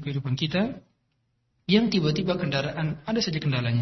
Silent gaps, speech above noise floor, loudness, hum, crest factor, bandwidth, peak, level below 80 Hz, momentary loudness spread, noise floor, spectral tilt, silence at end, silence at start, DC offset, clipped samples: none; 47 dB; -26 LUFS; none; 20 dB; 6.2 kHz; -6 dBFS; -54 dBFS; 8 LU; -73 dBFS; -6 dB/octave; 0 s; 0 s; under 0.1%; under 0.1%